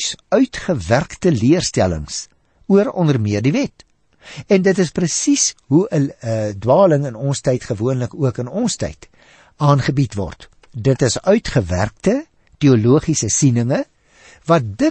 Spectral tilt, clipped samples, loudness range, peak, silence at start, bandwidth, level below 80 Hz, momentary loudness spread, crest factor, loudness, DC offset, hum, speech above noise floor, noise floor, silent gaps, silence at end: -5.5 dB/octave; under 0.1%; 3 LU; -2 dBFS; 0 s; 8.8 kHz; -42 dBFS; 10 LU; 16 dB; -17 LUFS; under 0.1%; none; 32 dB; -48 dBFS; none; 0 s